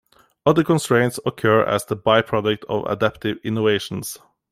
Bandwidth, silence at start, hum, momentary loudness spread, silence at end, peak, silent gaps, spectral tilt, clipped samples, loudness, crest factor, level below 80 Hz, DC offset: 16 kHz; 0.45 s; none; 9 LU; 0.35 s; -2 dBFS; none; -5.5 dB/octave; under 0.1%; -20 LUFS; 18 dB; -54 dBFS; under 0.1%